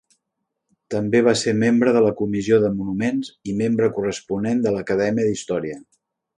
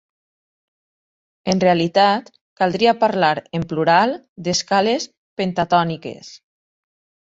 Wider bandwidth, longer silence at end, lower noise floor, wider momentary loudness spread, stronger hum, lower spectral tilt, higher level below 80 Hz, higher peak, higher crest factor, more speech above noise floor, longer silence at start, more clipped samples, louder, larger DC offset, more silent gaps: first, 10.5 kHz vs 8 kHz; second, 0.55 s vs 0.85 s; second, -79 dBFS vs under -90 dBFS; second, 9 LU vs 12 LU; neither; first, -6 dB/octave vs -4.5 dB/octave; about the same, -56 dBFS vs -58 dBFS; about the same, -4 dBFS vs -2 dBFS; about the same, 16 dB vs 18 dB; second, 59 dB vs over 72 dB; second, 0.9 s vs 1.45 s; neither; about the same, -20 LUFS vs -18 LUFS; neither; second, none vs 2.41-2.56 s, 4.29-4.36 s, 5.18-5.36 s